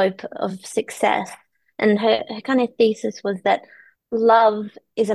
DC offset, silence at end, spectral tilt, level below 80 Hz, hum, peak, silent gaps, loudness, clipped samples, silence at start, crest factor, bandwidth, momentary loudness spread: under 0.1%; 0 s; -5 dB/octave; -68 dBFS; none; -4 dBFS; none; -20 LUFS; under 0.1%; 0 s; 16 dB; 12.5 kHz; 12 LU